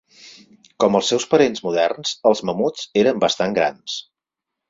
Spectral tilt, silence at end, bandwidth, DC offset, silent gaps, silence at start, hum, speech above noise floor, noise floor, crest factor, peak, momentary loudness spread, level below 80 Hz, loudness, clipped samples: -4 dB/octave; 0.7 s; 7.8 kHz; under 0.1%; none; 0.25 s; none; 66 dB; -84 dBFS; 18 dB; -2 dBFS; 6 LU; -60 dBFS; -19 LUFS; under 0.1%